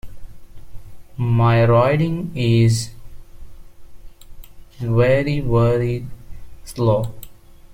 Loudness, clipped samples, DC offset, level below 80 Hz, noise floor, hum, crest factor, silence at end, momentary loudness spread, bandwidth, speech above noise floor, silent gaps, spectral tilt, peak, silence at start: -18 LUFS; under 0.1%; under 0.1%; -38 dBFS; -40 dBFS; none; 16 dB; 0 s; 16 LU; 15.5 kHz; 23 dB; none; -7 dB/octave; -4 dBFS; 0.05 s